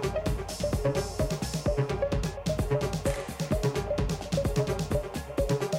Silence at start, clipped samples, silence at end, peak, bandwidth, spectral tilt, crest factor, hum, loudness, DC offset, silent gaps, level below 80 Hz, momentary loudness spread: 0 s; under 0.1%; 0 s; -14 dBFS; 16.5 kHz; -6 dB/octave; 14 dB; none; -30 LUFS; under 0.1%; none; -38 dBFS; 3 LU